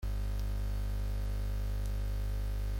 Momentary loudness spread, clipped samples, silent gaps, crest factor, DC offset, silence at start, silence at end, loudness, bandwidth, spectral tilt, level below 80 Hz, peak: 0 LU; under 0.1%; none; 10 dB; under 0.1%; 0 s; 0 s; -38 LUFS; 16.5 kHz; -6.5 dB/octave; -34 dBFS; -24 dBFS